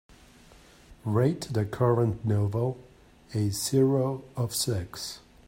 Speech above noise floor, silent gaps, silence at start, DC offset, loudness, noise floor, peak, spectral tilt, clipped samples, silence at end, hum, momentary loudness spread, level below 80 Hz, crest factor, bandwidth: 27 dB; none; 0.9 s; under 0.1%; -28 LUFS; -54 dBFS; -12 dBFS; -6 dB/octave; under 0.1%; 0.3 s; none; 12 LU; -56 dBFS; 18 dB; 16.5 kHz